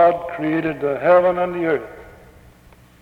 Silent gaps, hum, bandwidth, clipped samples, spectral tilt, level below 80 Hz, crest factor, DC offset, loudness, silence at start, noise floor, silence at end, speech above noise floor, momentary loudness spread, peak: none; none; 5.2 kHz; under 0.1%; -8 dB/octave; -52 dBFS; 16 dB; under 0.1%; -19 LUFS; 0 s; -49 dBFS; 0.9 s; 30 dB; 9 LU; -4 dBFS